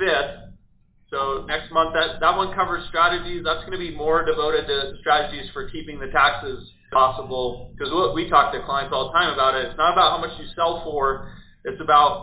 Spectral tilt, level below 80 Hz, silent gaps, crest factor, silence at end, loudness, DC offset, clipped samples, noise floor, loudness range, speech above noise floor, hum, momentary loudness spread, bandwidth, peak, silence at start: -7.5 dB/octave; -44 dBFS; none; 20 dB; 0 s; -21 LUFS; under 0.1%; under 0.1%; -57 dBFS; 2 LU; 35 dB; none; 13 LU; 4 kHz; -2 dBFS; 0 s